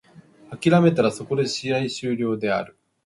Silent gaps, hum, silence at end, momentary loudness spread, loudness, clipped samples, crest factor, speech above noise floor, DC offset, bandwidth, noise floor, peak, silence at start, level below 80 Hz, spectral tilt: none; none; 0.4 s; 10 LU; -22 LUFS; under 0.1%; 20 dB; 28 dB; under 0.1%; 11.5 kHz; -49 dBFS; -4 dBFS; 0.15 s; -62 dBFS; -6 dB/octave